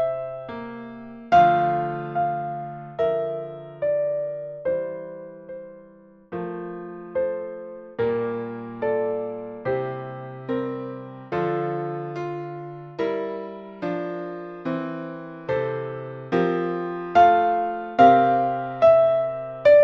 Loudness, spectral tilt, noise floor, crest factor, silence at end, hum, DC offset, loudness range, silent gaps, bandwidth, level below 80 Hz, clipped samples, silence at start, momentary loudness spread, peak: -24 LUFS; -8 dB/octave; -50 dBFS; 20 dB; 0 s; none; under 0.1%; 11 LU; none; 6.2 kHz; -62 dBFS; under 0.1%; 0 s; 19 LU; -2 dBFS